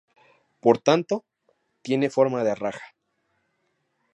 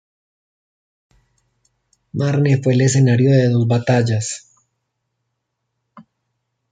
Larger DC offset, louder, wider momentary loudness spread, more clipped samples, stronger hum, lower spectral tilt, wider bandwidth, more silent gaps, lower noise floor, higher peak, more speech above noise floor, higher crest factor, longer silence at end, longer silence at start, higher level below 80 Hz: neither; second, -23 LUFS vs -16 LUFS; about the same, 12 LU vs 11 LU; neither; neither; about the same, -6 dB/octave vs -6.5 dB/octave; about the same, 9.2 kHz vs 9.4 kHz; neither; about the same, -73 dBFS vs -75 dBFS; about the same, -4 dBFS vs -2 dBFS; second, 51 dB vs 60 dB; first, 22 dB vs 16 dB; first, 1.3 s vs 0.7 s; second, 0.65 s vs 2.15 s; second, -72 dBFS vs -58 dBFS